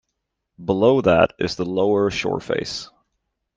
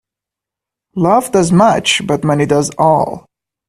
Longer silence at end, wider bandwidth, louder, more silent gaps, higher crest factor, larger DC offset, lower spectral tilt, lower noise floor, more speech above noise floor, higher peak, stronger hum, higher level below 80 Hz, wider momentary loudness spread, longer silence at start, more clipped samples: first, 0.7 s vs 0.5 s; second, 9.2 kHz vs 14 kHz; second, -20 LUFS vs -13 LUFS; neither; about the same, 18 dB vs 14 dB; neither; about the same, -5.5 dB/octave vs -5 dB/octave; second, -78 dBFS vs -85 dBFS; second, 59 dB vs 73 dB; about the same, -2 dBFS vs 0 dBFS; neither; about the same, -50 dBFS vs -48 dBFS; first, 12 LU vs 9 LU; second, 0.6 s vs 0.95 s; neither